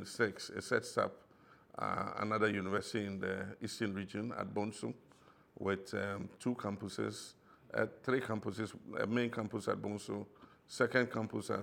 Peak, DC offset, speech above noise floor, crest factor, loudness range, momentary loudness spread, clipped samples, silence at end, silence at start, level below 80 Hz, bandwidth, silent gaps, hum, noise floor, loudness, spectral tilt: -16 dBFS; under 0.1%; 26 dB; 22 dB; 3 LU; 10 LU; under 0.1%; 0 s; 0 s; -78 dBFS; 17.5 kHz; none; none; -64 dBFS; -38 LUFS; -5.5 dB/octave